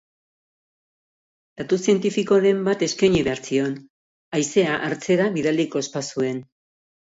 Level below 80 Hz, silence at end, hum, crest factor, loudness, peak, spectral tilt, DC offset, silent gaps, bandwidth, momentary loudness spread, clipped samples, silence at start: -56 dBFS; 0.6 s; none; 16 dB; -21 LUFS; -6 dBFS; -5 dB/octave; under 0.1%; 3.90-4.32 s; 8 kHz; 9 LU; under 0.1%; 1.6 s